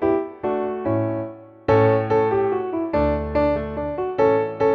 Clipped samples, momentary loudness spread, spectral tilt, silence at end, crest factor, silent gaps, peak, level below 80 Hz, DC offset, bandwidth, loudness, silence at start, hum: under 0.1%; 8 LU; -9.5 dB/octave; 0 s; 14 dB; none; -6 dBFS; -38 dBFS; under 0.1%; 6.2 kHz; -21 LUFS; 0 s; none